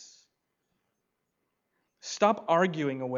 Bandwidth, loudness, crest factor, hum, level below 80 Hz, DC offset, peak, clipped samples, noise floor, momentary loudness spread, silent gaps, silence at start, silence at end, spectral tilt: 7.8 kHz; -27 LUFS; 24 dB; none; -84 dBFS; under 0.1%; -8 dBFS; under 0.1%; -81 dBFS; 14 LU; none; 0 s; 0 s; -5 dB/octave